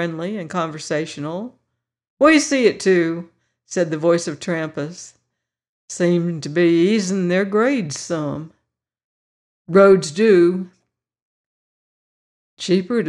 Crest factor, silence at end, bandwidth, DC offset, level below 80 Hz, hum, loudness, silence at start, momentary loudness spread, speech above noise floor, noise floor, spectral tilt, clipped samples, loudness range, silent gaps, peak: 16 dB; 0 s; 11 kHz; under 0.1%; -64 dBFS; none; -18 LUFS; 0 s; 16 LU; 59 dB; -77 dBFS; -5.5 dB/octave; under 0.1%; 3 LU; 2.10-2.17 s, 5.69-5.88 s, 9.04-9.65 s, 11.22-12.57 s; -4 dBFS